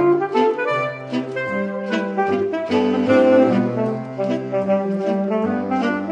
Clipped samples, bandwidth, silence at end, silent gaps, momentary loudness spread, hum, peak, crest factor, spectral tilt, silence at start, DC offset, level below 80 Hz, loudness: under 0.1%; 9.4 kHz; 0 s; none; 9 LU; none; -2 dBFS; 16 dB; -7.5 dB/octave; 0 s; under 0.1%; -66 dBFS; -20 LUFS